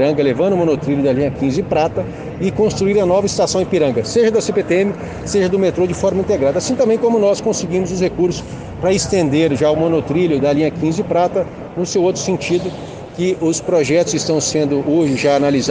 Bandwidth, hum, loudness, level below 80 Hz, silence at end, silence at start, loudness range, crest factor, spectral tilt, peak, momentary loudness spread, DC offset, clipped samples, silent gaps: 10 kHz; none; -16 LUFS; -42 dBFS; 0 s; 0 s; 2 LU; 14 dB; -5.5 dB/octave; -2 dBFS; 6 LU; under 0.1%; under 0.1%; none